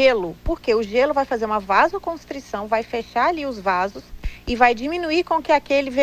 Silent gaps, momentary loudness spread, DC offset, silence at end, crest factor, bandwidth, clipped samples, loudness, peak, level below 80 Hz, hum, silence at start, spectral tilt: none; 12 LU; under 0.1%; 0 s; 18 dB; 15.5 kHz; under 0.1%; -21 LUFS; -2 dBFS; -38 dBFS; 60 Hz at -50 dBFS; 0 s; -5 dB/octave